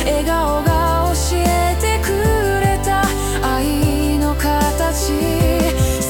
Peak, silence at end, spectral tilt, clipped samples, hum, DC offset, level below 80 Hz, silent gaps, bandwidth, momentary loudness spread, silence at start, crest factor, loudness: -4 dBFS; 0 s; -5 dB/octave; under 0.1%; none; under 0.1%; -22 dBFS; none; 18.5 kHz; 2 LU; 0 s; 12 dB; -17 LUFS